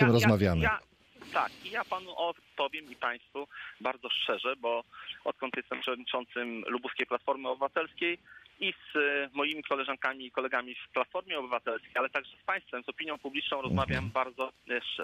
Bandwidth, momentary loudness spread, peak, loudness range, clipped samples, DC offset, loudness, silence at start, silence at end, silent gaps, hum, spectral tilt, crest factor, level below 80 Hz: 15 kHz; 8 LU; -10 dBFS; 2 LU; under 0.1%; under 0.1%; -33 LUFS; 0 s; 0 s; none; none; -5.5 dB/octave; 22 dB; -54 dBFS